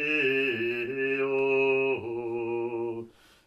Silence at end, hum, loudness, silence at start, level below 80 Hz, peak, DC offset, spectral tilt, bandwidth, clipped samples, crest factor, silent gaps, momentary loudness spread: 0.35 s; none; -28 LUFS; 0 s; -70 dBFS; -16 dBFS; under 0.1%; -6.5 dB/octave; 6.4 kHz; under 0.1%; 12 dB; none; 10 LU